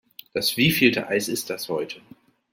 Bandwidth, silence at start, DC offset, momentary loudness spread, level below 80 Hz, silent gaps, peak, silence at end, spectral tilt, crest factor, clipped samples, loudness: 16.5 kHz; 0.35 s; under 0.1%; 15 LU; -60 dBFS; none; -4 dBFS; 0.55 s; -4 dB/octave; 20 dB; under 0.1%; -22 LUFS